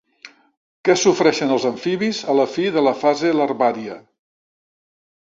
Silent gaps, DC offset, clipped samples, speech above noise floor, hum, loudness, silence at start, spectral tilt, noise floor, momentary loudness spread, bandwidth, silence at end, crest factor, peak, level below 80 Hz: 0.57-0.84 s; under 0.1%; under 0.1%; 28 dB; none; -18 LUFS; 0.25 s; -4 dB/octave; -46 dBFS; 7 LU; 7.8 kHz; 1.2 s; 18 dB; -2 dBFS; -64 dBFS